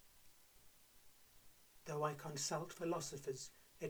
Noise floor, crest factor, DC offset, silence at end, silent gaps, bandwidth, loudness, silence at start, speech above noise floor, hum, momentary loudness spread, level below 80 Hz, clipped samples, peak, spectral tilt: -66 dBFS; 20 dB; under 0.1%; 0 s; none; over 20 kHz; -45 LUFS; 0 s; 22 dB; none; 23 LU; -74 dBFS; under 0.1%; -28 dBFS; -4 dB/octave